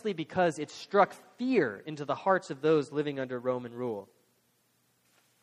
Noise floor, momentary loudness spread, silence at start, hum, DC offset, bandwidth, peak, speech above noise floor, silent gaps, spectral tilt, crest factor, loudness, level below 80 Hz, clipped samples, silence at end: -72 dBFS; 10 LU; 0.05 s; none; under 0.1%; 12.5 kHz; -10 dBFS; 41 dB; none; -6 dB/octave; 22 dB; -31 LUFS; -76 dBFS; under 0.1%; 1.4 s